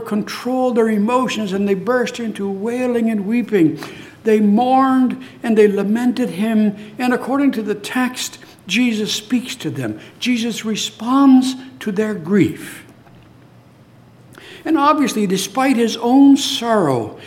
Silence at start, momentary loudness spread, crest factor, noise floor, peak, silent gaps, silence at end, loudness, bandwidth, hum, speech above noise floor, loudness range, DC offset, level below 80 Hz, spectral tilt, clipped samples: 0 s; 10 LU; 16 dB; -46 dBFS; -2 dBFS; none; 0 s; -17 LUFS; 16 kHz; none; 29 dB; 4 LU; under 0.1%; -64 dBFS; -5 dB/octave; under 0.1%